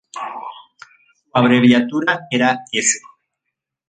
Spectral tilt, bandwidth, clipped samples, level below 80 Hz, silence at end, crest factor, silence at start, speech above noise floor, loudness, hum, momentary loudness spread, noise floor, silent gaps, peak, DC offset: -3.5 dB/octave; 9.6 kHz; under 0.1%; -64 dBFS; 0.9 s; 18 dB; 0.15 s; 64 dB; -16 LUFS; none; 17 LU; -79 dBFS; none; -2 dBFS; under 0.1%